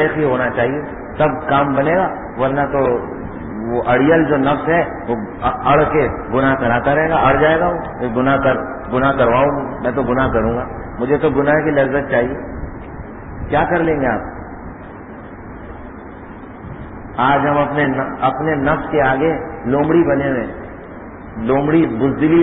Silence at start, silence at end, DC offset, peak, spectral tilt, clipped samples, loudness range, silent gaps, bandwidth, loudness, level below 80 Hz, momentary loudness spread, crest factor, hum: 0 s; 0 s; under 0.1%; -2 dBFS; -12 dB/octave; under 0.1%; 7 LU; none; 4 kHz; -16 LUFS; -36 dBFS; 19 LU; 14 dB; none